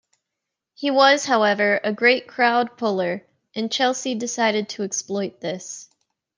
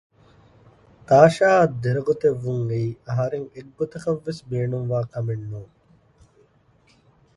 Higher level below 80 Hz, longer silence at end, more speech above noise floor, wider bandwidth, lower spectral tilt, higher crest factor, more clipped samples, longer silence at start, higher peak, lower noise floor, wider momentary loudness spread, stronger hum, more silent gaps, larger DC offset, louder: second, -76 dBFS vs -56 dBFS; second, 0.55 s vs 1.7 s; first, 62 dB vs 38 dB; second, 10 kHz vs 11.5 kHz; second, -3 dB/octave vs -7.5 dB/octave; about the same, 20 dB vs 22 dB; neither; second, 0.8 s vs 1.1 s; about the same, -2 dBFS vs 0 dBFS; first, -83 dBFS vs -59 dBFS; about the same, 14 LU vs 16 LU; neither; neither; neither; about the same, -21 LUFS vs -22 LUFS